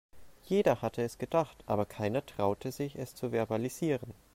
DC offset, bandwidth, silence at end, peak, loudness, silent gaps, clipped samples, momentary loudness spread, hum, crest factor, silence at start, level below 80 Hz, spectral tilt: under 0.1%; 16 kHz; 0.2 s; -14 dBFS; -33 LUFS; none; under 0.1%; 8 LU; none; 20 dB; 0.15 s; -62 dBFS; -6.5 dB/octave